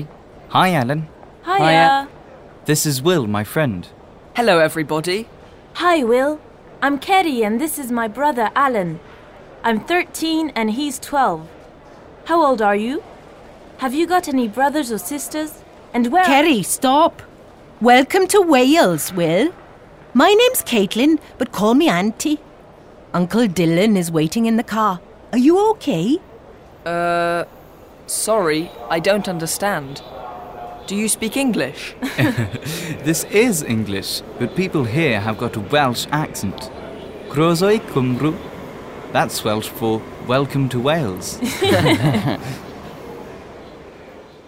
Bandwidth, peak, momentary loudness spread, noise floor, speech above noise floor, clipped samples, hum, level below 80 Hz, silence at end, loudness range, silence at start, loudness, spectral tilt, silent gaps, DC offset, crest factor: 16.5 kHz; -2 dBFS; 17 LU; -43 dBFS; 26 dB; under 0.1%; none; -50 dBFS; 0.2 s; 6 LU; 0 s; -18 LUFS; -4.5 dB/octave; none; under 0.1%; 16 dB